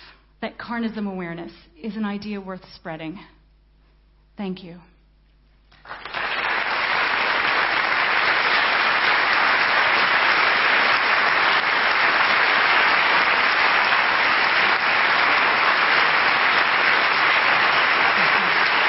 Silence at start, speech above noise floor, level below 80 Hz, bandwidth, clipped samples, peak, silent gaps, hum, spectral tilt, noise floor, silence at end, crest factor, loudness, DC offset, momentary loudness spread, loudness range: 0.4 s; 26 dB; -56 dBFS; 6 kHz; under 0.1%; -4 dBFS; none; none; -5.5 dB/octave; -56 dBFS; 0 s; 16 dB; -17 LUFS; under 0.1%; 16 LU; 17 LU